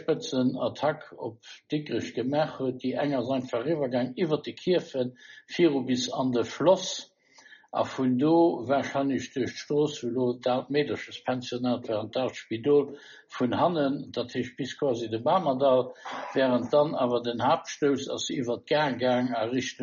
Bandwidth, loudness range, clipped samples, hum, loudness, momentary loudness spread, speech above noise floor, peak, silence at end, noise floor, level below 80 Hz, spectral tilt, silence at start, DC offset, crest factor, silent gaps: 7.2 kHz; 3 LU; under 0.1%; none; -28 LUFS; 9 LU; 28 dB; -10 dBFS; 0 s; -55 dBFS; -70 dBFS; -4.5 dB/octave; 0 s; under 0.1%; 18 dB; none